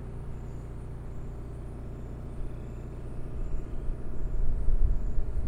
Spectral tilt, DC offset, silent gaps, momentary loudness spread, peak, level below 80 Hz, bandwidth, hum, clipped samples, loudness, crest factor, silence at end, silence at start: -9 dB/octave; under 0.1%; none; 10 LU; -12 dBFS; -32 dBFS; 2.7 kHz; 60 Hz at -45 dBFS; under 0.1%; -38 LUFS; 16 dB; 0 s; 0 s